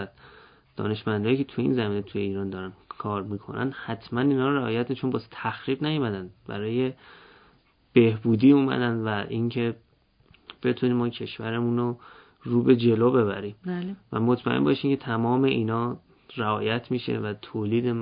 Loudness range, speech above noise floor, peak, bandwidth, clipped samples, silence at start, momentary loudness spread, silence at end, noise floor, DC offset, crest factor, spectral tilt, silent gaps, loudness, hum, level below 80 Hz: 5 LU; 36 dB; -6 dBFS; 5.2 kHz; under 0.1%; 0 s; 13 LU; 0 s; -61 dBFS; under 0.1%; 20 dB; -11.5 dB/octave; none; -26 LUFS; none; -60 dBFS